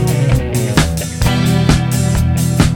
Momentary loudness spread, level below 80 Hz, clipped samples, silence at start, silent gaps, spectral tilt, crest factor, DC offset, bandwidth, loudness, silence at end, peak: 3 LU; -22 dBFS; under 0.1%; 0 s; none; -5.5 dB/octave; 12 dB; under 0.1%; 17.5 kHz; -14 LUFS; 0 s; 0 dBFS